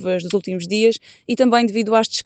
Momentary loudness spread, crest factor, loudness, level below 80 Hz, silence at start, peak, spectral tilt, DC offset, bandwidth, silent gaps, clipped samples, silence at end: 8 LU; 16 dB; -18 LUFS; -66 dBFS; 0 s; -4 dBFS; -4.5 dB/octave; under 0.1%; 9 kHz; none; under 0.1%; 0.05 s